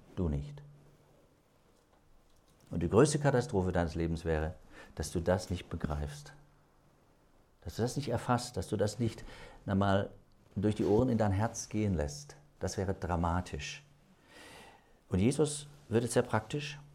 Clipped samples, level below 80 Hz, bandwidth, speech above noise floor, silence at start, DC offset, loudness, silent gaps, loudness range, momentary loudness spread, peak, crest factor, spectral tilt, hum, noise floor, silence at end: under 0.1%; -52 dBFS; 15 kHz; 34 dB; 0.15 s; under 0.1%; -33 LUFS; none; 6 LU; 19 LU; -12 dBFS; 22 dB; -6 dB/octave; none; -67 dBFS; 0.05 s